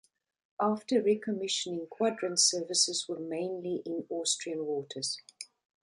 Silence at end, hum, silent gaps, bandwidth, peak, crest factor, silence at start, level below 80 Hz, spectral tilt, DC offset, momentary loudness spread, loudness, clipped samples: 0.5 s; none; none; 11.5 kHz; -12 dBFS; 20 dB; 0.6 s; -82 dBFS; -2.5 dB/octave; under 0.1%; 12 LU; -31 LUFS; under 0.1%